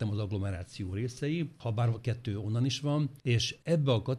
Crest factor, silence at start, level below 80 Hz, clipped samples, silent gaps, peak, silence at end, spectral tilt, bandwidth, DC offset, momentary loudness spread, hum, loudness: 14 dB; 0 s; -60 dBFS; under 0.1%; none; -16 dBFS; 0 s; -6 dB/octave; 11 kHz; under 0.1%; 6 LU; none; -32 LUFS